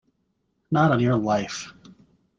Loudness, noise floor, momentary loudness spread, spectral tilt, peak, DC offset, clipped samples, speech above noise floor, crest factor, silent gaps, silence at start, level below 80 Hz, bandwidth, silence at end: -22 LUFS; -72 dBFS; 15 LU; -6.5 dB/octave; -6 dBFS; under 0.1%; under 0.1%; 51 dB; 20 dB; none; 0.7 s; -58 dBFS; 7.8 kHz; 0.65 s